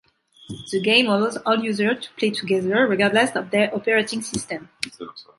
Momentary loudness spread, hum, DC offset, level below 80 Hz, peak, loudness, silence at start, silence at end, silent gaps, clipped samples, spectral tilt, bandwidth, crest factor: 14 LU; none; under 0.1%; -60 dBFS; -2 dBFS; -21 LUFS; 0.5 s; 0.15 s; none; under 0.1%; -4 dB/octave; 11.5 kHz; 20 dB